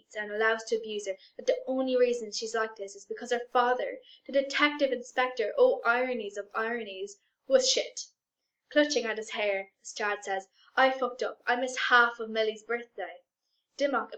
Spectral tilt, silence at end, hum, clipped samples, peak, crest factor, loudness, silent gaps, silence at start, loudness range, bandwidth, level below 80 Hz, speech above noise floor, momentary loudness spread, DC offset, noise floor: -1 dB/octave; 0 s; none; under 0.1%; -8 dBFS; 22 dB; -29 LUFS; none; 0.1 s; 2 LU; 8.8 kHz; -78 dBFS; 57 dB; 15 LU; under 0.1%; -86 dBFS